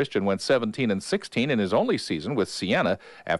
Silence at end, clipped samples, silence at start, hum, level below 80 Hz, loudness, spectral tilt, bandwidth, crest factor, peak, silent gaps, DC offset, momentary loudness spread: 0 s; under 0.1%; 0 s; none; -62 dBFS; -25 LUFS; -5 dB/octave; 11.5 kHz; 14 dB; -10 dBFS; none; under 0.1%; 4 LU